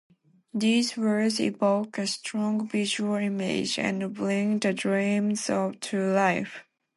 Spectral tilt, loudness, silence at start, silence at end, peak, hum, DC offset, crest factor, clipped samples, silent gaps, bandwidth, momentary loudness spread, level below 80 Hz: -4.5 dB/octave; -26 LUFS; 0.55 s; 0.35 s; -10 dBFS; none; under 0.1%; 16 dB; under 0.1%; none; 11.5 kHz; 6 LU; -70 dBFS